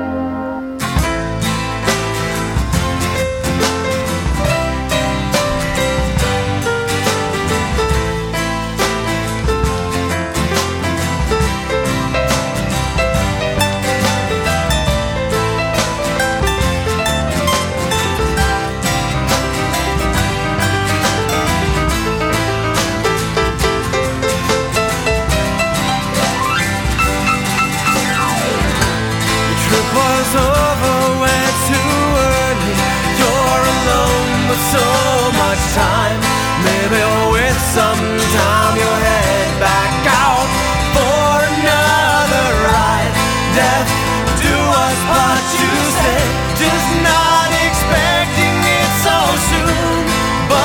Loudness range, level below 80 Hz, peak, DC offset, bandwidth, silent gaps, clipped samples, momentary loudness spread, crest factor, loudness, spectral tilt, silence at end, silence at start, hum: 4 LU; -26 dBFS; 0 dBFS; under 0.1%; 18 kHz; none; under 0.1%; 5 LU; 14 dB; -14 LUFS; -4 dB/octave; 0 s; 0 s; none